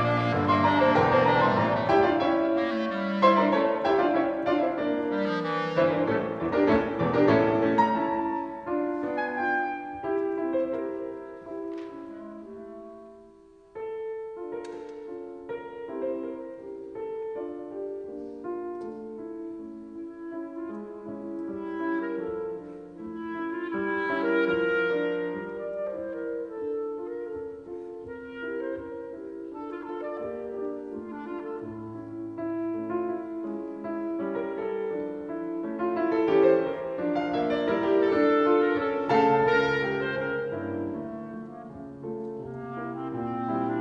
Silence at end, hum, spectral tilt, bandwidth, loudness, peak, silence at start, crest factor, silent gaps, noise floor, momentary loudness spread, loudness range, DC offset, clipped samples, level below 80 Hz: 0 s; none; -7.5 dB/octave; 7.2 kHz; -28 LUFS; -8 dBFS; 0 s; 20 dB; none; -54 dBFS; 17 LU; 13 LU; under 0.1%; under 0.1%; -60 dBFS